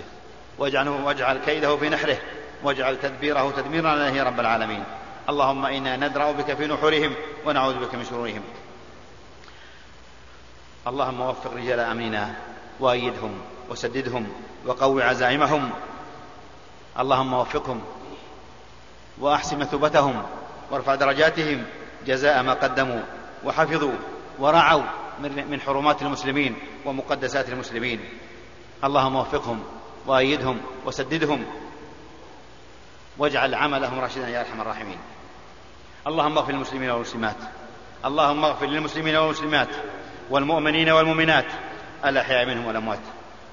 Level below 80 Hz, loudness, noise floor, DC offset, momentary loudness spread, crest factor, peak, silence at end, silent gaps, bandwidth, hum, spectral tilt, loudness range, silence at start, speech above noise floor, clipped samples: -52 dBFS; -23 LUFS; -48 dBFS; 0.4%; 17 LU; 22 dB; -2 dBFS; 0 s; none; 7.4 kHz; none; -2.5 dB/octave; 7 LU; 0 s; 25 dB; under 0.1%